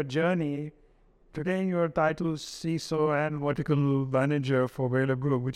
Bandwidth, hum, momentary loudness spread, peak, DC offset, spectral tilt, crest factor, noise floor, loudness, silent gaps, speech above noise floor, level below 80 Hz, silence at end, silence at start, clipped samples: 13 kHz; none; 7 LU; -12 dBFS; under 0.1%; -7 dB/octave; 16 dB; -60 dBFS; -28 LUFS; none; 33 dB; -58 dBFS; 0 s; 0 s; under 0.1%